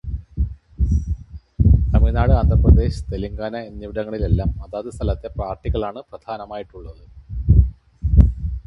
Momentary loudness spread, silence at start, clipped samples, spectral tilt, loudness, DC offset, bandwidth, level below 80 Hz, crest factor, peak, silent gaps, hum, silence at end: 17 LU; 0.05 s; under 0.1%; -9.5 dB/octave; -20 LUFS; under 0.1%; 6 kHz; -20 dBFS; 18 dB; 0 dBFS; none; none; 0.05 s